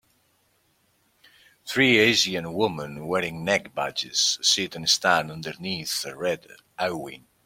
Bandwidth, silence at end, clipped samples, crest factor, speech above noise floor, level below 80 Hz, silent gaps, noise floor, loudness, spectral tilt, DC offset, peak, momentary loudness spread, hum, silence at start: 16.5 kHz; 0.3 s; under 0.1%; 22 dB; 42 dB; -64 dBFS; none; -67 dBFS; -23 LUFS; -2.5 dB/octave; under 0.1%; -4 dBFS; 15 LU; none; 1.65 s